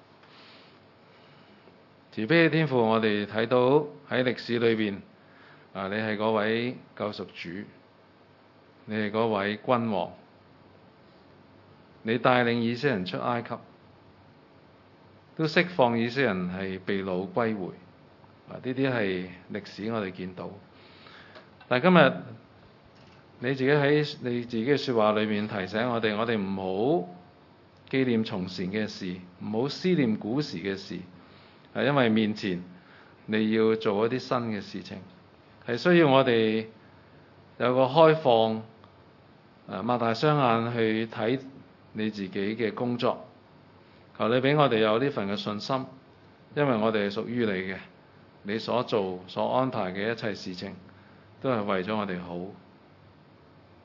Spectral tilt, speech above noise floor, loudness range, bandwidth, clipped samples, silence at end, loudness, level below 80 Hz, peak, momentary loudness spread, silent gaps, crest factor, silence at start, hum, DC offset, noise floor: -7 dB/octave; 31 dB; 7 LU; 6 kHz; under 0.1%; 1.3 s; -27 LUFS; -74 dBFS; -2 dBFS; 16 LU; none; 26 dB; 2.1 s; none; under 0.1%; -57 dBFS